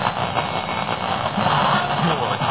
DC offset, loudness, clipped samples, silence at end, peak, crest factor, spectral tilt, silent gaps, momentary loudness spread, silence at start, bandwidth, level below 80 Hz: 0.4%; -21 LUFS; under 0.1%; 0 s; -4 dBFS; 16 dB; -9.5 dB/octave; none; 5 LU; 0 s; 4 kHz; -46 dBFS